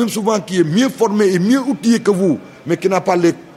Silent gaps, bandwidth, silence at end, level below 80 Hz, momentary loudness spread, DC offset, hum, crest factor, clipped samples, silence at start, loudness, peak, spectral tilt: none; 16 kHz; 0.05 s; -62 dBFS; 4 LU; under 0.1%; none; 14 dB; under 0.1%; 0 s; -15 LUFS; 0 dBFS; -5.5 dB/octave